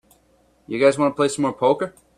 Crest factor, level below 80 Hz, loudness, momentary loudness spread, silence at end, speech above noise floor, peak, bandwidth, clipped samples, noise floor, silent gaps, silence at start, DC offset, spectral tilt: 18 dB; -62 dBFS; -20 LUFS; 6 LU; 0.3 s; 40 dB; -4 dBFS; 13.5 kHz; under 0.1%; -59 dBFS; none; 0.7 s; under 0.1%; -5 dB/octave